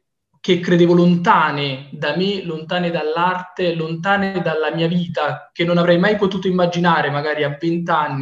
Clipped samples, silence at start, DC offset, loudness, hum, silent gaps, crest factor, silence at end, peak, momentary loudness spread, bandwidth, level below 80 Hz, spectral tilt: under 0.1%; 0.45 s; under 0.1%; -18 LUFS; none; none; 16 dB; 0 s; 0 dBFS; 9 LU; 7.4 kHz; -58 dBFS; -7 dB/octave